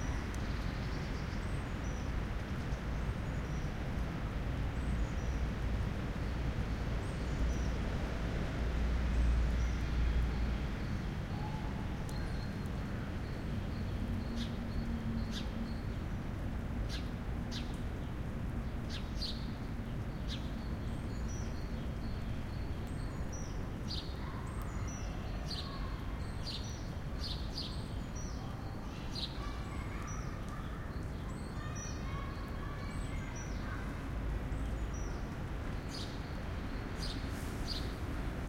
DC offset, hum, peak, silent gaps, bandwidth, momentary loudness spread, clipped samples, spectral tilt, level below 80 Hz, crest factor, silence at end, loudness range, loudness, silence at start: under 0.1%; none; -22 dBFS; none; 15.5 kHz; 5 LU; under 0.1%; -6 dB/octave; -40 dBFS; 14 dB; 0 s; 5 LU; -40 LUFS; 0 s